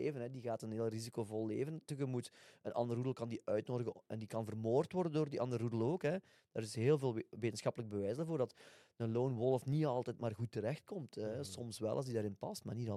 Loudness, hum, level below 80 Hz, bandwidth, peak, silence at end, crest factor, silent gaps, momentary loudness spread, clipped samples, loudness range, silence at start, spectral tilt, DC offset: -40 LUFS; none; -80 dBFS; 14 kHz; -22 dBFS; 0 s; 18 dB; none; 9 LU; under 0.1%; 4 LU; 0 s; -7 dB/octave; under 0.1%